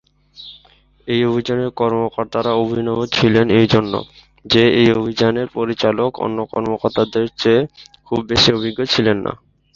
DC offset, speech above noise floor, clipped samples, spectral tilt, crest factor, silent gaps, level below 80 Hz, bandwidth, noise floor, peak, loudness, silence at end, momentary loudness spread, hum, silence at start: under 0.1%; 34 dB; under 0.1%; -6 dB/octave; 16 dB; none; -46 dBFS; 7.4 kHz; -50 dBFS; 0 dBFS; -17 LUFS; 0.4 s; 11 LU; none; 0.4 s